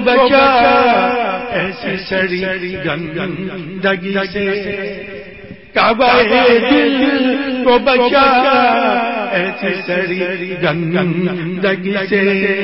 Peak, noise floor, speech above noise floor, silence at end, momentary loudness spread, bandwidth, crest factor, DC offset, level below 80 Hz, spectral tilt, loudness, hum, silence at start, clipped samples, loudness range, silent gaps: 0 dBFS; -34 dBFS; 21 dB; 0 s; 11 LU; 5.8 kHz; 14 dB; 0.4%; -46 dBFS; -10 dB/octave; -14 LUFS; none; 0 s; under 0.1%; 7 LU; none